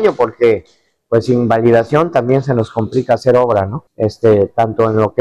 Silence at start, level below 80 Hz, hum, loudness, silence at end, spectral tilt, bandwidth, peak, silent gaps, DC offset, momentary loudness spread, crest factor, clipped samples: 0 s; -50 dBFS; none; -14 LUFS; 0 s; -8 dB/octave; 10.5 kHz; -2 dBFS; none; under 0.1%; 6 LU; 10 dB; under 0.1%